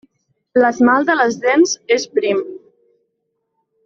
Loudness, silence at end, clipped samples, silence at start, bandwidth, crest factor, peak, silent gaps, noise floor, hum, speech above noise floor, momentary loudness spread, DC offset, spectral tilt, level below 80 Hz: -15 LUFS; 1.3 s; under 0.1%; 0.55 s; 7.6 kHz; 14 dB; -2 dBFS; none; -72 dBFS; none; 57 dB; 7 LU; under 0.1%; -3 dB/octave; -62 dBFS